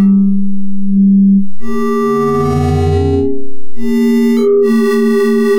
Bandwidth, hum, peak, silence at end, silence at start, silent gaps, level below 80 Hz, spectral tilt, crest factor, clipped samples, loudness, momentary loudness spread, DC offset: 15.5 kHz; none; -2 dBFS; 0 s; 0 s; none; -34 dBFS; -8 dB/octave; 8 dB; under 0.1%; -12 LUFS; 9 LU; under 0.1%